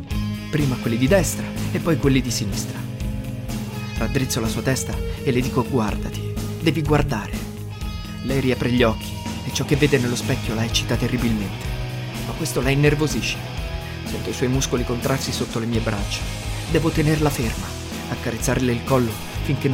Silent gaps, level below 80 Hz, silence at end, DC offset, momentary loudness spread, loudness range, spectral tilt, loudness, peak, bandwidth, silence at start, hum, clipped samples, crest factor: none; -32 dBFS; 0 s; under 0.1%; 10 LU; 2 LU; -5 dB/octave; -23 LUFS; -2 dBFS; 16.5 kHz; 0 s; none; under 0.1%; 20 dB